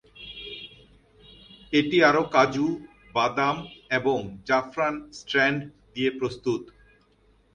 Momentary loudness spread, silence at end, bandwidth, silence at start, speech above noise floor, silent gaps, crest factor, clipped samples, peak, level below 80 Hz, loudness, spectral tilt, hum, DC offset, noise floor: 18 LU; 0.9 s; 9.6 kHz; 0.15 s; 37 dB; none; 20 dB; under 0.1%; -6 dBFS; -58 dBFS; -25 LUFS; -5 dB/octave; none; under 0.1%; -62 dBFS